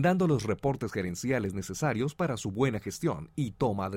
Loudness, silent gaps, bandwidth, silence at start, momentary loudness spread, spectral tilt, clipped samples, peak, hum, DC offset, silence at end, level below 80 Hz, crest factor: -31 LUFS; none; 16.5 kHz; 0 s; 6 LU; -6.5 dB/octave; under 0.1%; -14 dBFS; none; under 0.1%; 0 s; -54 dBFS; 16 dB